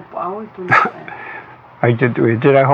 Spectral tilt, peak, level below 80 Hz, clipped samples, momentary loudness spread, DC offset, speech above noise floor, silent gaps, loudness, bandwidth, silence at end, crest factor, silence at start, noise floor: -8.5 dB/octave; 0 dBFS; -62 dBFS; under 0.1%; 18 LU; under 0.1%; 21 dB; none; -15 LUFS; 7.4 kHz; 0 s; 16 dB; 0 s; -36 dBFS